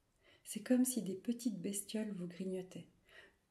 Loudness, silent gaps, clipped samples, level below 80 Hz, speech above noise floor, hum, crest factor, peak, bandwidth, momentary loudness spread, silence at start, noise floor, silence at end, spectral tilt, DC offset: -40 LUFS; none; under 0.1%; -80 dBFS; 25 dB; none; 18 dB; -22 dBFS; 15.5 kHz; 19 LU; 0.45 s; -64 dBFS; 0.25 s; -4.5 dB/octave; under 0.1%